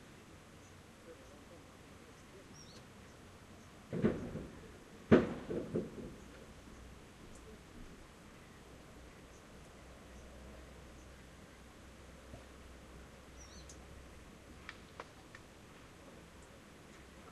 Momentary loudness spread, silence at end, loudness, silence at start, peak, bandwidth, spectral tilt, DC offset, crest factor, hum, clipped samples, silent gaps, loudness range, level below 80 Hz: 16 LU; 0 s; -40 LUFS; 0 s; -12 dBFS; 13 kHz; -6.5 dB/octave; under 0.1%; 32 dB; none; under 0.1%; none; 18 LU; -60 dBFS